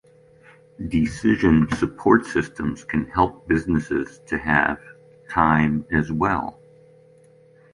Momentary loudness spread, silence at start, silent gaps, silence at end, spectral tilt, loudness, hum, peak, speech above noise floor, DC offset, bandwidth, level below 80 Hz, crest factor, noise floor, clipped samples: 9 LU; 0.8 s; none; 1.2 s; -7 dB/octave; -21 LUFS; none; -2 dBFS; 32 dB; under 0.1%; 11 kHz; -42 dBFS; 20 dB; -52 dBFS; under 0.1%